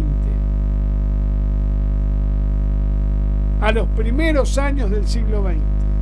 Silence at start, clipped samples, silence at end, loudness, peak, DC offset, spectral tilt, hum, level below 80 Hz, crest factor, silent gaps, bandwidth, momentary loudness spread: 0 s; under 0.1%; 0 s; -20 LUFS; -2 dBFS; under 0.1%; -7 dB/octave; 50 Hz at -15 dBFS; -18 dBFS; 14 dB; none; 10 kHz; 3 LU